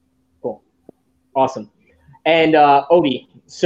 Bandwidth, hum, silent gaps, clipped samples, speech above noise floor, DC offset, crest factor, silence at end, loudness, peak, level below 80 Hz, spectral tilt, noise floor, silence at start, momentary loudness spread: 8 kHz; none; none; under 0.1%; 35 dB; under 0.1%; 16 dB; 0 s; -15 LUFS; -2 dBFS; -60 dBFS; -5.5 dB/octave; -50 dBFS; 0.45 s; 18 LU